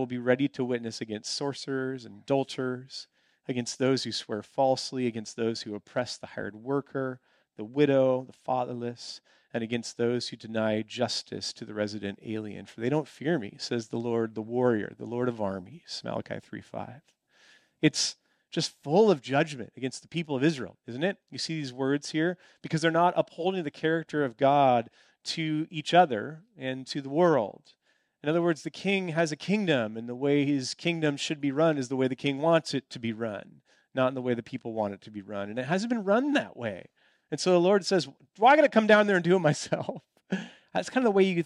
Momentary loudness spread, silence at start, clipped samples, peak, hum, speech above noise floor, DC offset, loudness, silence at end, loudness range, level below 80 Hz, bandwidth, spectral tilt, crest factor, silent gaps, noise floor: 14 LU; 0 s; under 0.1%; -8 dBFS; none; 33 dB; under 0.1%; -28 LUFS; 0 s; 8 LU; -76 dBFS; 11.5 kHz; -5 dB/octave; 20 dB; none; -61 dBFS